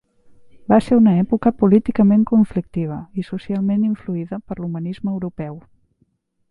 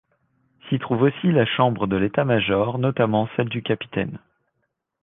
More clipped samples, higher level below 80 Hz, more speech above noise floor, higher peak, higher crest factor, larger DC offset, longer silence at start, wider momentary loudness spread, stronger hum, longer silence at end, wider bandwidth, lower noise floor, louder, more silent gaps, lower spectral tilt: neither; first, -48 dBFS vs -54 dBFS; second, 47 dB vs 54 dB; first, 0 dBFS vs -4 dBFS; about the same, 18 dB vs 18 dB; neither; about the same, 0.55 s vs 0.65 s; first, 14 LU vs 8 LU; neither; about the same, 0.9 s vs 0.85 s; first, 4.9 kHz vs 3.9 kHz; second, -64 dBFS vs -75 dBFS; first, -18 LUFS vs -22 LUFS; neither; about the same, -9.5 dB/octave vs -10.5 dB/octave